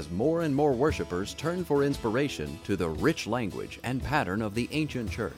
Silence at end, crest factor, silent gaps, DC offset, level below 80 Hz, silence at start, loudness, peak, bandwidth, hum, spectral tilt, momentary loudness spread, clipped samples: 0 s; 16 dB; none; under 0.1%; -48 dBFS; 0 s; -29 LUFS; -12 dBFS; 16.5 kHz; none; -6 dB/octave; 7 LU; under 0.1%